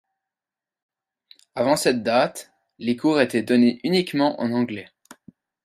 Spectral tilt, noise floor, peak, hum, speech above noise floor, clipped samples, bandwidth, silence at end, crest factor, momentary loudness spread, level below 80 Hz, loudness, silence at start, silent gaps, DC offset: -5 dB/octave; under -90 dBFS; -4 dBFS; none; over 69 dB; under 0.1%; 14.5 kHz; 0.8 s; 20 dB; 11 LU; -68 dBFS; -21 LUFS; 1.55 s; none; under 0.1%